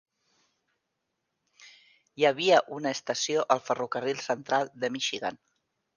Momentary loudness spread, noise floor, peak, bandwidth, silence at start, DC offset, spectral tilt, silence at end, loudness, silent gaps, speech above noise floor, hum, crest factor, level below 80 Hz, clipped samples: 9 LU; -82 dBFS; -6 dBFS; 10 kHz; 1.6 s; under 0.1%; -3 dB/octave; 0.6 s; -28 LUFS; none; 54 dB; none; 24 dB; -78 dBFS; under 0.1%